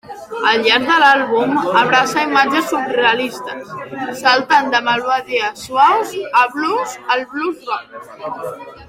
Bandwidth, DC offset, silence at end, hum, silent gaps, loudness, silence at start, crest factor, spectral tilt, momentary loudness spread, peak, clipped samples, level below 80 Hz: 16.5 kHz; under 0.1%; 0.05 s; none; none; -15 LUFS; 0.1 s; 16 dB; -3 dB/octave; 16 LU; 0 dBFS; under 0.1%; -58 dBFS